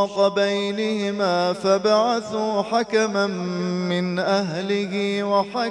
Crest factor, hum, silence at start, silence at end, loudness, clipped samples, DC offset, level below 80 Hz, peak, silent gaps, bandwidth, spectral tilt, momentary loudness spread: 16 dB; none; 0 s; 0 s; -22 LUFS; under 0.1%; under 0.1%; -66 dBFS; -6 dBFS; none; 11.5 kHz; -5 dB/octave; 5 LU